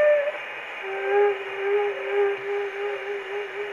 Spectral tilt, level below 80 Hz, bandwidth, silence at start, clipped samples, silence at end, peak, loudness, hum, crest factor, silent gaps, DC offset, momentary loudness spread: -4 dB/octave; -74 dBFS; 7.2 kHz; 0 s; under 0.1%; 0 s; -10 dBFS; -26 LUFS; none; 14 dB; none; under 0.1%; 9 LU